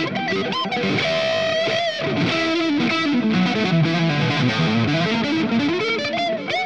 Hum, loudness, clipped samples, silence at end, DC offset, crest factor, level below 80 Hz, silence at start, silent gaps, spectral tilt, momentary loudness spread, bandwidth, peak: none; -20 LUFS; under 0.1%; 0 s; 0.3%; 14 dB; -56 dBFS; 0 s; none; -5.5 dB/octave; 3 LU; 8.8 kHz; -6 dBFS